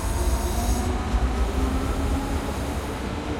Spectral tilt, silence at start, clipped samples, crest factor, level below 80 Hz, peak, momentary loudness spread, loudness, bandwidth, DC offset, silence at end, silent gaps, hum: -5.5 dB/octave; 0 s; under 0.1%; 14 dB; -26 dBFS; -12 dBFS; 4 LU; -26 LUFS; 16.5 kHz; 0.1%; 0 s; none; none